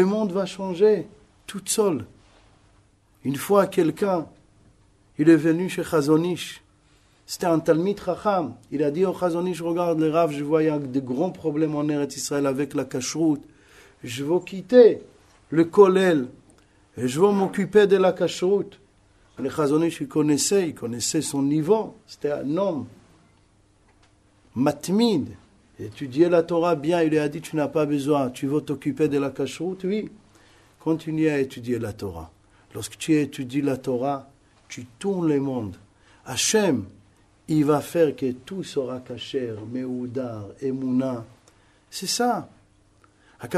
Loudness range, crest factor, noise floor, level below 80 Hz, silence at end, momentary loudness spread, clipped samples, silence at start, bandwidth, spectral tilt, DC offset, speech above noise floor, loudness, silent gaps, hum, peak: 8 LU; 22 dB; -59 dBFS; -60 dBFS; 0 s; 15 LU; under 0.1%; 0 s; 13.5 kHz; -5.5 dB/octave; under 0.1%; 37 dB; -23 LUFS; none; none; -2 dBFS